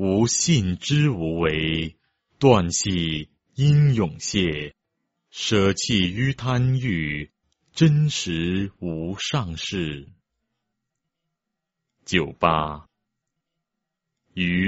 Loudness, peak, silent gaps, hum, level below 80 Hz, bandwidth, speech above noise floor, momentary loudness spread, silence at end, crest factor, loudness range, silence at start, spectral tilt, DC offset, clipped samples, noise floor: -22 LUFS; -2 dBFS; none; none; -46 dBFS; 8 kHz; 61 dB; 13 LU; 0 s; 22 dB; 7 LU; 0 s; -5 dB/octave; under 0.1%; under 0.1%; -82 dBFS